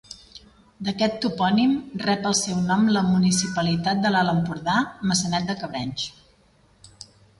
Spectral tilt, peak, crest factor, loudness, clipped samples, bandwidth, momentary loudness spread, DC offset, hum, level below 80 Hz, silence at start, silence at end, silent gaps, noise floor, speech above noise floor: -4.5 dB/octave; -8 dBFS; 14 dB; -23 LUFS; under 0.1%; 11.5 kHz; 10 LU; under 0.1%; none; -56 dBFS; 0.1 s; 1.3 s; none; -58 dBFS; 36 dB